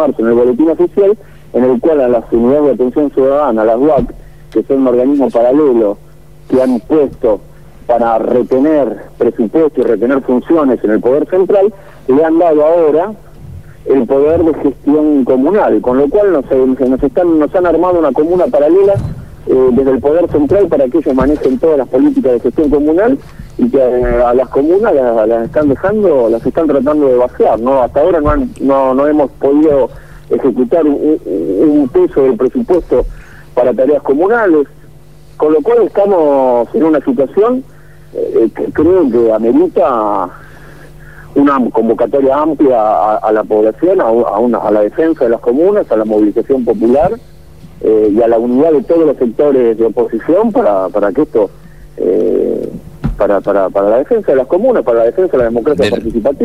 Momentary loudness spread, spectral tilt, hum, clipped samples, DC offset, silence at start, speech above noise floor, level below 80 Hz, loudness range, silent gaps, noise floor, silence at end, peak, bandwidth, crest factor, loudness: 5 LU; -8.5 dB/octave; none; under 0.1%; 1%; 0 s; 28 dB; -34 dBFS; 2 LU; none; -38 dBFS; 0 s; 0 dBFS; 12 kHz; 10 dB; -11 LUFS